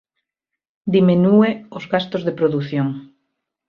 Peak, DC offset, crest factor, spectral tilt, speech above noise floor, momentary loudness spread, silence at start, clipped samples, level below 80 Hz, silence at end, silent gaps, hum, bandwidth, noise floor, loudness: -2 dBFS; under 0.1%; 16 dB; -9 dB/octave; 67 dB; 14 LU; 0.85 s; under 0.1%; -60 dBFS; 0.65 s; none; none; 6.2 kHz; -84 dBFS; -18 LUFS